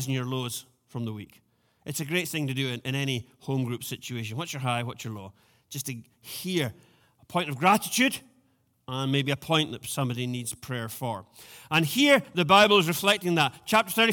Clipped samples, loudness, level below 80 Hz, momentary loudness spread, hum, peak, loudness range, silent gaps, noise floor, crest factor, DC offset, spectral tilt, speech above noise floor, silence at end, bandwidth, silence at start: under 0.1%; -26 LUFS; -66 dBFS; 17 LU; none; -6 dBFS; 10 LU; none; -68 dBFS; 22 dB; under 0.1%; -4 dB/octave; 41 dB; 0 s; 19 kHz; 0 s